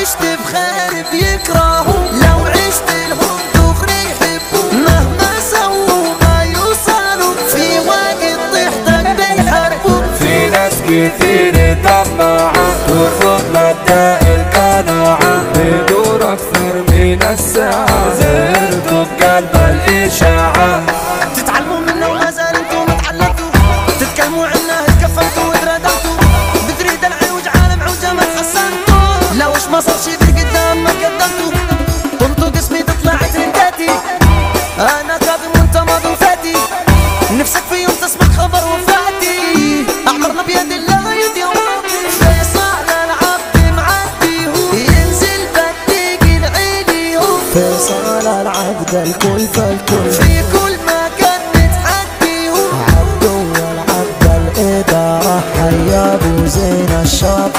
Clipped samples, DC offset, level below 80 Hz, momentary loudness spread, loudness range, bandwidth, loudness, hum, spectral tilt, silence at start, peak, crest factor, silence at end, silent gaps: under 0.1%; under 0.1%; -20 dBFS; 4 LU; 2 LU; 16.5 kHz; -11 LUFS; none; -4.5 dB/octave; 0 s; 0 dBFS; 10 dB; 0 s; none